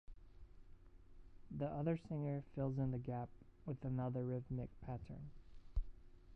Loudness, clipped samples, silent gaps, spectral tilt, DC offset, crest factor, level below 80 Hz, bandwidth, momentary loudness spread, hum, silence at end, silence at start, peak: -45 LUFS; under 0.1%; none; -10 dB/octave; under 0.1%; 18 dB; -56 dBFS; 5 kHz; 13 LU; none; 0 s; 0.1 s; -26 dBFS